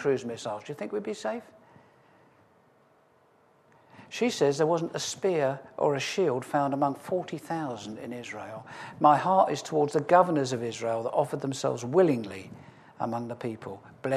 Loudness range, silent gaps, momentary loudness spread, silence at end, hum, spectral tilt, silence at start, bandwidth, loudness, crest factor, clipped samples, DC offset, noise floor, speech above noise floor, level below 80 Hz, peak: 13 LU; none; 16 LU; 0 s; none; -5.5 dB/octave; 0 s; 14 kHz; -28 LUFS; 22 dB; under 0.1%; under 0.1%; -63 dBFS; 35 dB; -76 dBFS; -6 dBFS